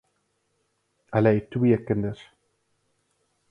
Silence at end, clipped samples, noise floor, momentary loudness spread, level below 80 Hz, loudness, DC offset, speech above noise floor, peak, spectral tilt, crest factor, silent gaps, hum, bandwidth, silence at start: 1.35 s; under 0.1%; -73 dBFS; 10 LU; -56 dBFS; -24 LUFS; under 0.1%; 50 dB; -6 dBFS; -10 dB/octave; 22 dB; none; none; 6.6 kHz; 1.1 s